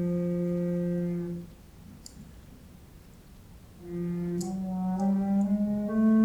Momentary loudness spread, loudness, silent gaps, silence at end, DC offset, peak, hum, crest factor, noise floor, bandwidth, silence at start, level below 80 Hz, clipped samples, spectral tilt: 23 LU; -30 LUFS; none; 0 s; under 0.1%; -14 dBFS; none; 14 dB; -51 dBFS; 15 kHz; 0 s; -54 dBFS; under 0.1%; -8.5 dB/octave